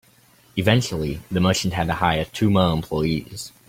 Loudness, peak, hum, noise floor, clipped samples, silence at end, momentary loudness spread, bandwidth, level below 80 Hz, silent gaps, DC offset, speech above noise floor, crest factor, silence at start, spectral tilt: -22 LUFS; -2 dBFS; none; -55 dBFS; under 0.1%; 0.2 s; 9 LU; 16.5 kHz; -44 dBFS; none; under 0.1%; 34 dB; 20 dB; 0.55 s; -5.5 dB/octave